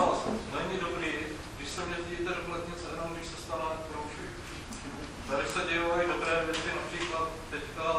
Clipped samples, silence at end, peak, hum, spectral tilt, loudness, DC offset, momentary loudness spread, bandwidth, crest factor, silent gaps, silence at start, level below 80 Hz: under 0.1%; 0 s; -14 dBFS; none; -4 dB/octave; -34 LUFS; under 0.1%; 12 LU; 14 kHz; 18 dB; none; 0 s; -50 dBFS